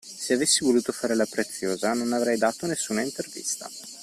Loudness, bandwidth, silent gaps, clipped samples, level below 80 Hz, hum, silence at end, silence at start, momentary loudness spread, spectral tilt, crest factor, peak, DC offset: -25 LUFS; 15 kHz; none; under 0.1%; -66 dBFS; none; 0 s; 0.05 s; 10 LU; -2.5 dB/octave; 18 dB; -8 dBFS; under 0.1%